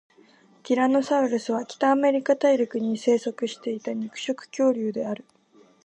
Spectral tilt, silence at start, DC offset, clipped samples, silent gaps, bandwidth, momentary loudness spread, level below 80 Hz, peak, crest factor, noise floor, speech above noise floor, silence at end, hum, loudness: -5 dB/octave; 0.65 s; under 0.1%; under 0.1%; none; 9 kHz; 10 LU; -80 dBFS; -8 dBFS; 16 dB; -56 dBFS; 33 dB; 0.7 s; none; -24 LUFS